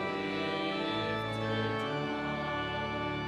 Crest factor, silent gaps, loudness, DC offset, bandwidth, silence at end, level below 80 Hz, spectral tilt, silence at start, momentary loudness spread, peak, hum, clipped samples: 12 dB; none; -33 LUFS; under 0.1%; 12.5 kHz; 0 s; -58 dBFS; -6 dB/octave; 0 s; 2 LU; -20 dBFS; none; under 0.1%